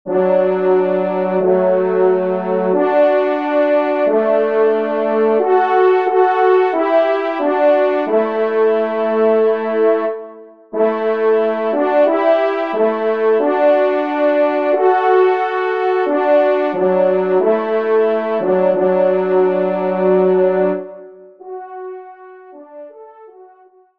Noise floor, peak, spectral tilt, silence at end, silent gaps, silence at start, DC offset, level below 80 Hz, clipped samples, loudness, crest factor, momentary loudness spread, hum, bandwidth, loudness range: -48 dBFS; -2 dBFS; -8.5 dB/octave; 0.55 s; none; 0.05 s; 0.3%; -70 dBFS; under 0.1%; -15 LUFS; 14 dB; 4 LU; none; 5.2 kHz; 2 LU